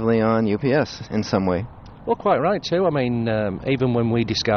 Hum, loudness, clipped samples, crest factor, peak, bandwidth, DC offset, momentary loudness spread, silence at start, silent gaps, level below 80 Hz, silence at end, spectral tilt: none; -21 LUFS; under 0.1%; 14 dB; -6 dBFS; 6.6 kHz; under 0.1%; 7 LU; 0 s; none; -48 dBFS; 0 s; -6.5 dB/octave